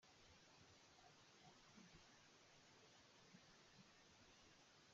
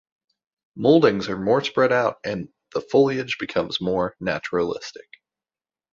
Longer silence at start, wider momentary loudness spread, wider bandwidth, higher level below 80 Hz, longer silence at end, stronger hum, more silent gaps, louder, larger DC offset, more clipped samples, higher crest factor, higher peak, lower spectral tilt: second, 0 s vs 0.75 s; second, 2 LU vs 13 LU; about the same, 7.4 kHz vs 7.6 kHz; second, -86 dBFS vs -56 dBFS; second, 0 s vs 0.95 s; neither; neither; second, -69 LUFS vs -22 LUFS; neither; neither; about the same, 16 dB vs 20 dB; second, -54 dBFS vs -2 dBFS; second, -2.5 dB/octave vs -6 dB/octave